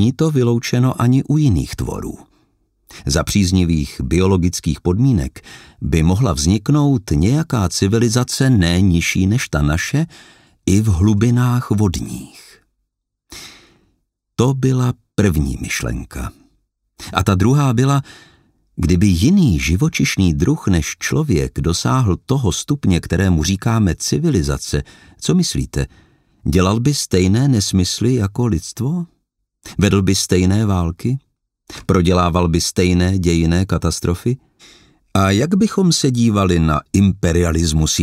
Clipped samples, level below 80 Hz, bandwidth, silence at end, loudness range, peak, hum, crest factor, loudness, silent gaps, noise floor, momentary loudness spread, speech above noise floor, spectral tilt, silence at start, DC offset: under 0.1%; -32 dBFS; 16 kHz; 0 s; 4 LU; 0 dBFS; none; 16 dB; -16 LUFS; none; -74 dBFS; 10 LU; 58 dB; -5.5 dB/octave; 0 s; under 0.1%